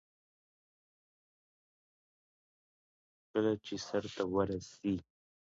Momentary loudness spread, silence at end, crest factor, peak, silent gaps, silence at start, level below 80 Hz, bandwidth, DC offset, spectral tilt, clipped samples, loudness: 5 LU; 0.4 s; 20 dB; -20 dBFS; none; 3.35 s; -66 dBFS; 7.6 kHz; under 0.1%; -5.5 dB/octave; under 0.1%; -37 LUFS